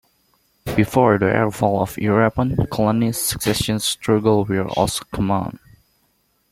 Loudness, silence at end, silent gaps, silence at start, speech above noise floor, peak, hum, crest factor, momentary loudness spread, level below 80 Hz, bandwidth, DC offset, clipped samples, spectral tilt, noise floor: -19 LUFS; 0.95 s; none; 0.65 s; 46 dB; 0 dBFS; none; 18 dB; 6 LU; -42 dBFS; 16.5 kHz; under 0.1%; under 0.1%; -5 dB/octave; -64 dBFS